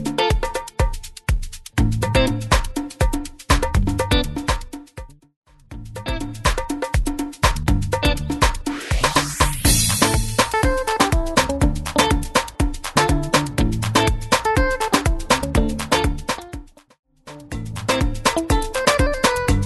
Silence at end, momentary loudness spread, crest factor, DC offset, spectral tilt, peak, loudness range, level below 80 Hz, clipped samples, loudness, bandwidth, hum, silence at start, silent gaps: 0 s; 10 LU; 20 dB; under 0.1%; -4 dB/octave; 0 dBFS; 6 LU; -26 dBFS; under 0.1%; -20 LUFS; 12.5 kHz; none; 0 s; 5.36-5.42 s, 16.99-17.03 s